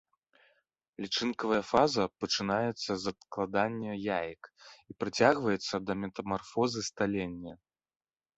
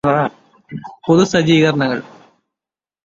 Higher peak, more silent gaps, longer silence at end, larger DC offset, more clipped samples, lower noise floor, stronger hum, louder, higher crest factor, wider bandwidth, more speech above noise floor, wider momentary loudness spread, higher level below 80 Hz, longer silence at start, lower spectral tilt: second, -8 dBFS vs -2 dBFS; neither; second, 0.8 s vs 1 s; neither; neither; second, -74 dBFS vs -89 dBFS; neither; second, -32 LUFS vs -15 LUFS; first, 24 dB vs 16 dB; about the same, 8.2 kHz vs 7.8 kHz; second, 43 dB vs 74 dB; second, 14 LU vs 20 LU; second, -64 dBFS vs -52 dBFS; first, 1 s vs 0.05 s; second, -4.5 dB/octave vs -6 dB/octave